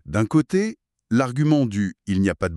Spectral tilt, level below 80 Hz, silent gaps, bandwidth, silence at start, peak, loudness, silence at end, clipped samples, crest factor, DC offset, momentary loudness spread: -7 dB/octave; -48 dBFS; none; 12 kHz; 0.05 s; -6 dBFS; -22 LUFS; 0 s; under 0.1%; 16 dB; under 0.1%; 5 LU